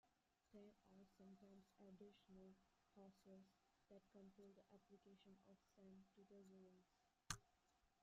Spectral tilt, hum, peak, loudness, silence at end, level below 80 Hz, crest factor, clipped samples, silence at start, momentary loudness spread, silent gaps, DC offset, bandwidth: -4 dB/octave; none; -30 dBFS; -64 LUFS; 0 s; -82 dBFS; 38 dB; under 0.1%; 0.05 s; 13 LU; none; under 0.1%; 7.4 kHz